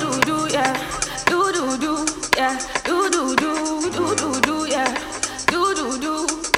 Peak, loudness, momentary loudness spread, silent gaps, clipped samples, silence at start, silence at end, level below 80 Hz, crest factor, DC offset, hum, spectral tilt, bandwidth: -4 dBFS; -20 LUFS; 4 LU; none; under 0.1%; 0 s; 0 s; -48 dBFS; 18 dB; under 0.1%; none; -2.5 dB/octave; 19.5 kHz